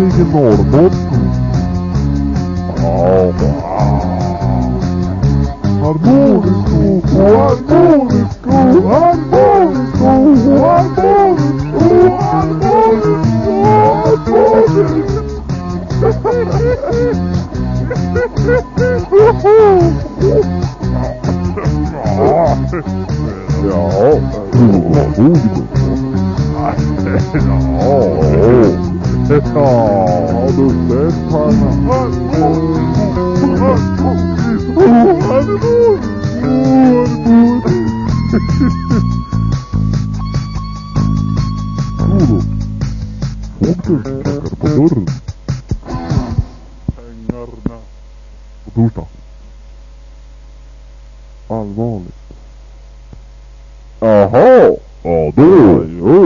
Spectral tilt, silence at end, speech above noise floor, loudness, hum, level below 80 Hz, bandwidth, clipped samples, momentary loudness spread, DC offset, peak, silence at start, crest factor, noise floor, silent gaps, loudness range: -9 dB/octave; 0 s; 25 dB; -11 LUFS; none; -26 dBFS; 7.4 kHz; 0.1%; 11 LU; under 0.1%; 0 dBFS; 0 s; 12 dB; -34 dBFS; none; 13 LU